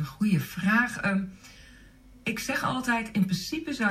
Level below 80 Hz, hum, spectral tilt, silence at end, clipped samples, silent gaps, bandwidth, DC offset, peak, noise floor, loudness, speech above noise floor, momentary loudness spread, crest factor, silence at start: -56 dBFS; none; -5 dB/octave; 0 s; under 0.1%; none; 15.5 kHz; under 0.1%; -12 dBFS; -52 dBFS; -28 LUFS; 25 dB; 8 LU; 18 dB; 0 s